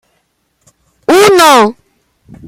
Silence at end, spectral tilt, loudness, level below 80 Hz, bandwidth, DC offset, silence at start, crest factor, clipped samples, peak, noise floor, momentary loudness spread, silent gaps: 0.75 s; -3 dB/octave; -6 LUFS; -52 dBFS; 17 kHz; under 0.1%; 1.1 s; 10 dB; 0.2%; 0 dBFS; -60 dBFS; 10 LU; none